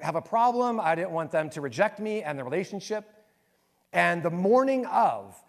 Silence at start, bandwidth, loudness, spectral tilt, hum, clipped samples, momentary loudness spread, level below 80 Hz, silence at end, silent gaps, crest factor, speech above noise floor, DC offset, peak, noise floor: 0 s; 14 kHz; -27 LUFS; -6 dB/octave; none; under 0.1%; 10 LU; -76 dBFS; 0.15 s; none; 18 dB; 43 dB; under 0.1%; -8 dBFS; -70 dBFS